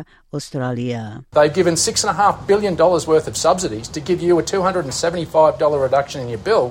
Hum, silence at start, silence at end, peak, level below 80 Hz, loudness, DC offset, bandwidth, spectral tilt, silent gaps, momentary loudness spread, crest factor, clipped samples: none; 0 s; 0 s; -2 dBFS; -46 dBFS; -18 LUFS; under 0.1%; 16.5 kHz; -4.5 dB/octave; none; 10 LU; 16 dB; under 0.1%